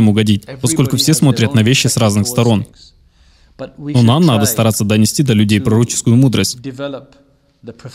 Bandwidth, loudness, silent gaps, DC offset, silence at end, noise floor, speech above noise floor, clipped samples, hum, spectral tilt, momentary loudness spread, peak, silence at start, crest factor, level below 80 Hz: 16 kHz; -13 LUFS; none; under 0.1%; 0.05 s; -48 dBFS; 36 dB; under 0.1%; none; -5 dB/octave; 15 LU; 0 dBFS; 0 s; 12 dB; -46 dBFS